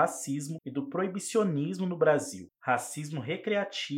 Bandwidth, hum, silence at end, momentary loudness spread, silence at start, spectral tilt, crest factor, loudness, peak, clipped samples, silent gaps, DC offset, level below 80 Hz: 16.5 kHz; none; 0 s; 10 LU; 0 s; -5 dB/octave; 20 dB; -31 LUFS; -10 dBFS; under 0.1%; none; under 0.1%; -82 dBFS